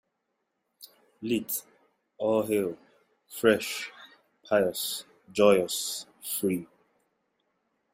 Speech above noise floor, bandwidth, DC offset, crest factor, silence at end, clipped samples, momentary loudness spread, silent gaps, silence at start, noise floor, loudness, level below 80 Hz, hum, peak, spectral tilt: 53 dB; 16 kHz; under 0.1%; 22 dB; 1.3 s; under 0.1%; 13 LU; none; 0.8 s; -80 dBFS; -28 LUFS; -70 dBFS; none; -8 dBFS; -3.5 dB/octave